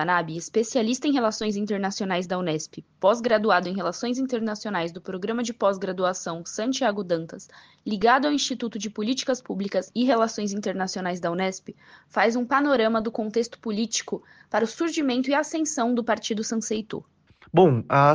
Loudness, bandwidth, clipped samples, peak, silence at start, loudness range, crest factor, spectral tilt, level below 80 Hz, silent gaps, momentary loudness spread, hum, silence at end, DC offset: -25 LUFS; 10 kHz; under 0.1%; -6 dBFS; 0 s; 2 LU; 20 dB; -4.5 dB/octave; -66 dBFS; none; 10 LU; none; 0 s; under 0.1%